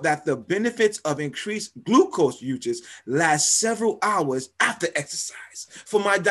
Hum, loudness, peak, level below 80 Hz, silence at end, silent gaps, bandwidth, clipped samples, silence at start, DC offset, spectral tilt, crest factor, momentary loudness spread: none; -23 LUFS; -6 dBFS; -68 dBFS; 0 s; none; 13 kHz; under 0.1%; 0 s; under 0.1%; -3 dB/octave; 18 dB; 12 LU